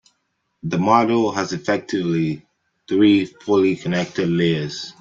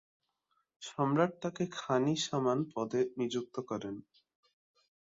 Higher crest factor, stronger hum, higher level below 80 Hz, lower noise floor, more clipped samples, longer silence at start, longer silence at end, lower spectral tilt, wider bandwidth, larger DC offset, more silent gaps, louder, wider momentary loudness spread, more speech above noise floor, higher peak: about the same, 18 dB vs 18 dB; neither; first, -58 dBFS vs -76 dBFS; second, -72 dBFS vs -80 dBFS; neither; second, 0.65 s vs 0.8 s; second, 0.1 s vs 1.1 s; about the same, -6 dB/octave vs -5.5 dB/octave; about the same, 7.6 kHz vs 7.8 kHz; neither; neither; first, -19 LUFS vs -34 LUFS; second, 9 LU vs 12 LU; first, 53 dB vs 46 dB; first, -2 dBFS vs -16 dBFS